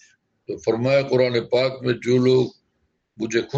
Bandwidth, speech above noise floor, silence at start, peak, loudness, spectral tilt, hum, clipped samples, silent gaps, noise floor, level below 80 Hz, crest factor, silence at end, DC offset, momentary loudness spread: 8 kHz; 51 dB; 0.5 s; -6 dBFS; -21 LUFS; -6.5 dB/octave; none; under 0.1%; none; -71 dBFS; -60 dBFS; 16 dB; 0 s; under 0.1%; 10 LU